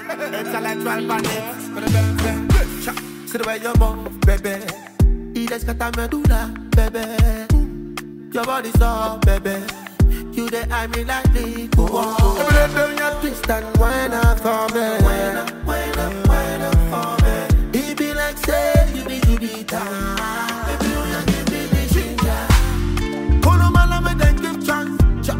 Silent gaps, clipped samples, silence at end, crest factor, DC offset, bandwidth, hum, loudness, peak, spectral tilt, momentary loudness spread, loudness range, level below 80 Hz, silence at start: none; under 0.1%; 0 s; 16 dB; under 0.1%; 16.5 kHz; none; -19 LUFS; -2 dBFS; -5.5 dB/octave; 8 LU; 3 LU; -20 dBFS; 0 s